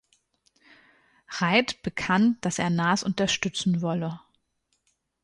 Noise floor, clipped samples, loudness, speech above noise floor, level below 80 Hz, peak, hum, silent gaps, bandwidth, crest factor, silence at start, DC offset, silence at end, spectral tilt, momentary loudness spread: -74 dBFS; under 0.1%; -25 LUFS; 49 dB; -60 dBFS; -8 dBFS; none; none; 11.5 kHz; 20 dB; 1.3 s; under 0.1%; 1.05 s; -4.5 dB/octave; 9 LU